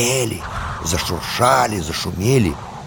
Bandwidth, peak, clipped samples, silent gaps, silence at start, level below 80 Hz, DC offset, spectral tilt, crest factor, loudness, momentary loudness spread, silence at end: over 20 kHz; 0 dBFS; under 0.1%; none; 0 s; -36 dBFS; under 0.1%; -4 dB/octave; 20 dB; -19 LUFS; 9 LU; 0 s